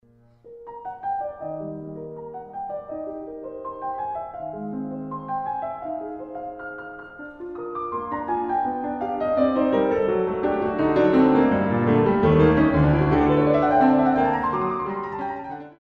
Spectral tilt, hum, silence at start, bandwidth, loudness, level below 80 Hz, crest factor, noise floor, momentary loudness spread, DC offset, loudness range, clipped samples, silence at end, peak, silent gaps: -10 dB/octave; none; 0.45 s; 5.8 kHz; -22 LUFS; -44 dBFS; 16 dB; -52 dBFS; 18 LU; under 0.1%; 14 LU; under 0.1%; 0.1 s; -6 dBFS; none